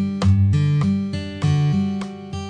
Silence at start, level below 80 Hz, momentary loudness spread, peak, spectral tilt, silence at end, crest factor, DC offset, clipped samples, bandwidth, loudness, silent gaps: 0 s; -44 dBFS; 10 LU; -8 dBFS; -8 dB/octave; 0 s; 12 dB; under 0.1%; under 0.1%; 9.4 kHz; -20 LUFS; none